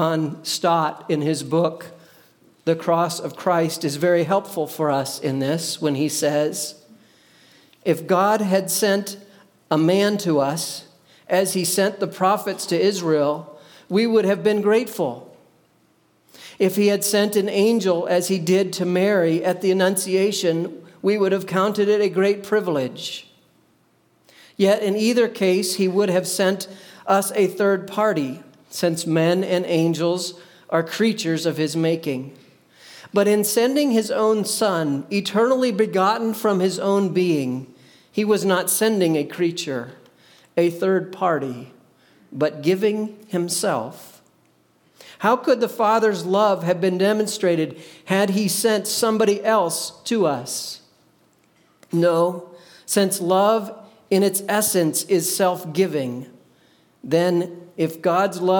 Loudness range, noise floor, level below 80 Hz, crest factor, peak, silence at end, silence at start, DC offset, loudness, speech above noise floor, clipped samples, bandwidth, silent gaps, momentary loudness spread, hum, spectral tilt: 4 LU; -61 dBFS; -74 dBFS; 16 dB; -4 dBFS; 0 s; 0 s; under 0.1%; -21 LUFS; 41 dB; under 0.1%; 19 kHz; none; 9 LU; none; -4.5 dB/octave